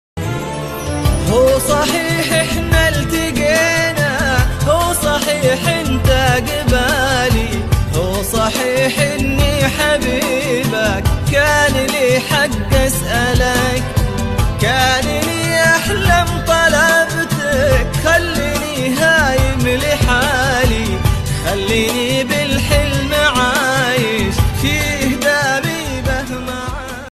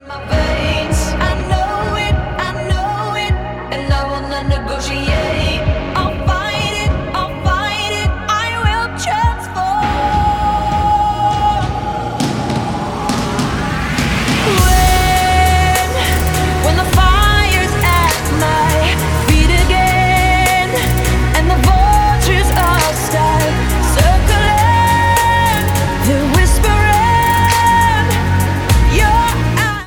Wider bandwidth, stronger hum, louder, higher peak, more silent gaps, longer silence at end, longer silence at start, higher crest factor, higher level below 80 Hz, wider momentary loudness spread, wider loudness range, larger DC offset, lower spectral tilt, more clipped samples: second, 15.5 kHz vs over 20 kHz; neither; about the same, -14 LUFS vs -14 LUFS; about the same, 0 dBFS vs 0 dBFS; neither; about the same, 0 s vs 0 s; about the same, 0.15 s vs 0.05 s; about the same, 14 dB vs 12 dB; second, -24 dBFS vs -18 dBFS; about the same, 6 LU vs 7 LU; second, 2 LU vs 6 LU; neither; about the same, -4 dB/octave vs -4.5 dB/octave; neither